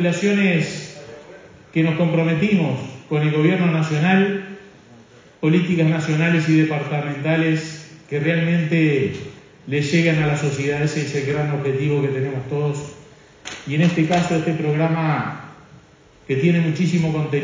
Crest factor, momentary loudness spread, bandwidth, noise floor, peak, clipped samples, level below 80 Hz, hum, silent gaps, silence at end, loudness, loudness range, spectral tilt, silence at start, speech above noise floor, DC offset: 16 dB; 15 LU; 7.6 kHz; -49 dBFS; -4 dBFS; under 0.1%; -56 dBFS; none; none; 0 s; -20 LUFS; 2 LU; -7 dB/octave; 0 s; 31 dB; under 0.1%